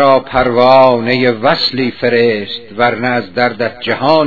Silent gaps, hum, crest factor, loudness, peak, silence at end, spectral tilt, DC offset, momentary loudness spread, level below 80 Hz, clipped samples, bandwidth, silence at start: none; none; 12 dB; -12 LUFS; 0 dBFS; 0 s; -7 dB/octave; 1%; 8 LU; -42 dBFS; 0.6%; 5.4 kHz; 0 s